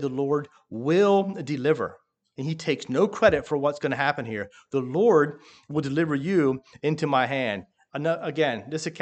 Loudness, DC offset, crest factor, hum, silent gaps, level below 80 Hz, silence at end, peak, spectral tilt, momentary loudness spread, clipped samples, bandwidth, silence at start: -25 LUFS; under 0.1%; 20 dB; none; none; -60 dBFS; 0 s; -4 dBFS; -6.5 dB/octave; 12 LU; under 0.1%; 8.8 kHz; 0 s